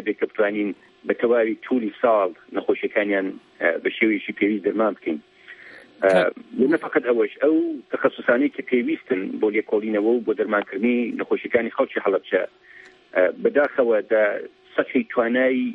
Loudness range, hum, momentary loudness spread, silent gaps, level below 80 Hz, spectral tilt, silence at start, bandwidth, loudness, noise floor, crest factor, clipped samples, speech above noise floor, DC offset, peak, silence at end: 2 LU; none; 7 LU; none; -70 dBFS; -7 dB/octave; 0 s; 10.5 kHz; -22 LUFS; -45 dBFS; 18 dB; under 0.1%; 23 dB; under 0.1%; -4 dBFS; 0 s